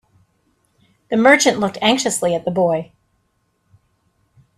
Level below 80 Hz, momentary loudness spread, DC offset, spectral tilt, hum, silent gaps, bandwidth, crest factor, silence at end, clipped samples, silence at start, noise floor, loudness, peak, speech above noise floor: -60 dBFS; 11 LU; under 0.1%; -3.5 dB/octave; none; none; 14 kHz; 20 dB; 1.75 s; under 0.1%; 1.1 s; -66 dBFS; -16 LUFS; 0 dBFS; 50 dB